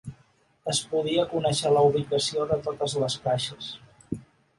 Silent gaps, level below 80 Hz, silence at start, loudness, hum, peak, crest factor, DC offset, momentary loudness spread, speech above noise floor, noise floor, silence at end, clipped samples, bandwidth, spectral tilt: none; -58 dBFS; 0.05 s; -25 LUFS; none; -10 dBFS; 16 dB; under 0.1%; 17 LU; 38 dB; -63 dBFS; 0.35 s; under 0.1%; 11.5 kHz; -4.5 dB/octave